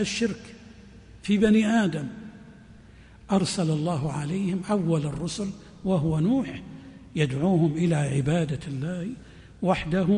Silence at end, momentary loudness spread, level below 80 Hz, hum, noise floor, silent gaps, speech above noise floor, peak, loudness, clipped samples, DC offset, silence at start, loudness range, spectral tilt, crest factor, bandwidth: 0 s; 15 LU; -50 dBFS; none; -49 dBFS; none; 25 dB; -10 dBFS; -26 LUFS; under 0.1%; under 0.1%; 0 s; 2 LU; -6.5 dB/octave; 16 dB; 10.5 kHz